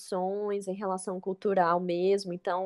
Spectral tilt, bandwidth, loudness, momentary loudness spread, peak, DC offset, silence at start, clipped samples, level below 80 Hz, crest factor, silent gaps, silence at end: -6 dB/octave; 12 kHz; -30 LUFS; 7 LU; -12 dBFS; under 0.1%; 0 s; under 0.1%; -80 dBFS; 18 dB; none; 0 s